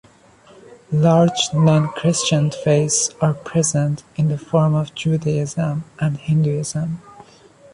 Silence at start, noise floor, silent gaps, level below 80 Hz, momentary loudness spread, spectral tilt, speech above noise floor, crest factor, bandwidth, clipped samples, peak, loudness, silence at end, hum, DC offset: 0.7 s; -49 dBFS; none; -54 dBFS; 8 LU; -5.5 dB/octave; 31 dB; 16 dB; 11 kHz; under 0.1%; -2 dBFS; -19 LUFS; 0.5 s; none; under 0.1%